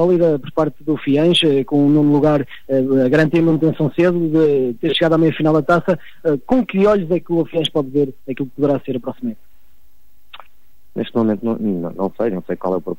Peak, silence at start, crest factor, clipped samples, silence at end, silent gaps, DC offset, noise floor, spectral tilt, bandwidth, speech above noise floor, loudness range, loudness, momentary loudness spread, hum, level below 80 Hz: -4 dBFS; 0 s; 12 dB; under 0.1%; 0.05 s; none; 2%; -58 dBFS; -7.5 dB/octave; 16 kHz; 41 dB; 9 LU; -17 LUFS; 9 LU; none; -50 dBFS